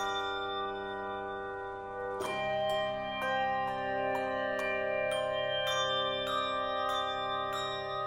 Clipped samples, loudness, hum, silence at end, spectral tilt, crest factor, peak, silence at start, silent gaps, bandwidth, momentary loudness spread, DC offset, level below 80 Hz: under 0.1%; -33 LUFS; none; 0 s; -3 dB/octave; 14 dB; -20 dBFS; 0 s; none; 16.5 kHz; 7 LU; under 0.1%; -62 dBFS